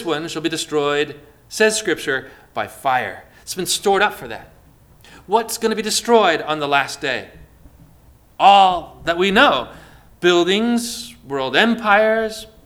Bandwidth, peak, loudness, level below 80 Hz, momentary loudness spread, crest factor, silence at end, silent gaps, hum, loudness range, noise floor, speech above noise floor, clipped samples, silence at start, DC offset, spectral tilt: 19.5 kHz; 0 dBFS; -17 LUFS; -50 dBFS; 14 LU; 18 dB; 0.2 s; none; none; 5 LU; -49 dBFS; 31 dB; under 0.1%; 0 s; under 0.1%; -3 dB/octave